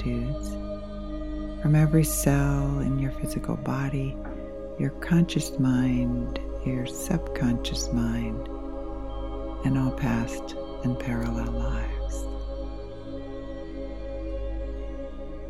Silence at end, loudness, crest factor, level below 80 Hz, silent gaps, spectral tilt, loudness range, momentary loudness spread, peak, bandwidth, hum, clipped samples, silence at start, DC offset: 0 s; -29 LUFS; 20 dB; -34 dBFS; none; -6.5 dB/octave; 8 LU; 14 LU; -8 dBFS; 16 kHz; none; under 0.1%; 0 s; 0.7%